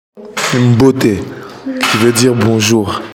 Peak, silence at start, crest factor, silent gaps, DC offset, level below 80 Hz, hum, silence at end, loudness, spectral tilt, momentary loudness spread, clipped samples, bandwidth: 0 dBFS; 0.15 s; 12 dB; none; under 0.1%; -46 dBFS; none; 0 s; -11 LUFS; -5 dB/octave; 14 LU; under 0.1%; 17 kHz